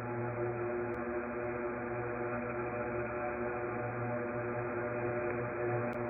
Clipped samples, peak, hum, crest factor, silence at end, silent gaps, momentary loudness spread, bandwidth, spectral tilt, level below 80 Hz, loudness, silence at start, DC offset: under 0.1%; -24 dBFS; none; 12 dB; 0 s; none; 2 LU; 2.8 kHz; -3.5 dB/octave; -60 dBFS; -37 LUFS; 0 s; under 0.1%